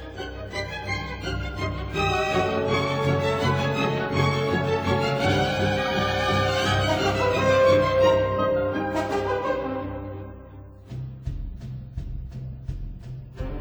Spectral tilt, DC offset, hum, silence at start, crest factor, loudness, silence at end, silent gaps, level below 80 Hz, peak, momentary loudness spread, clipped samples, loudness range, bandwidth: -5.5 dB/octave; under 0.1%; none; 0 s; 16 dB; -24 LUFS; 0 s; none; -40 dBFS; -8 dBFS; 16 LU; under 0.1%; 13 LU; over 20 kHz